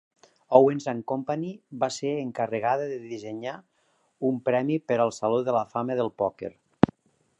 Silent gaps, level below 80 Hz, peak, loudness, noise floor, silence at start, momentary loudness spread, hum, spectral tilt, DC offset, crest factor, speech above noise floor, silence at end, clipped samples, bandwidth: none; -62 dBFS; 0 dBFS; -27 LUFS; -62 dBFS; 0.5 s; 14 LU; none; -6.5 dB/octave; under 0.1%; 26 dB; 36 dB; 0.9 s; under 0.1%; 10.5 kHz